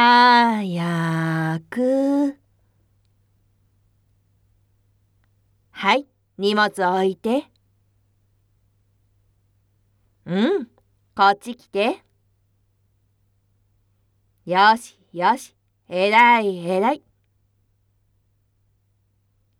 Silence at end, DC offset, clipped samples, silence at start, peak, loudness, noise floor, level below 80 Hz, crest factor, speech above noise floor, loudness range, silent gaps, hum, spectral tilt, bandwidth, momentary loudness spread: 2.65 s; under 0.1%; under 0.1%; 0 s; -2 dBFS; -19 LUFS; -66 dBFS; -68 dBFS; 20 dB; 47 dB; 10 LU; none; none; -5.5 dB/octave; 14.5 kHz; 14 LU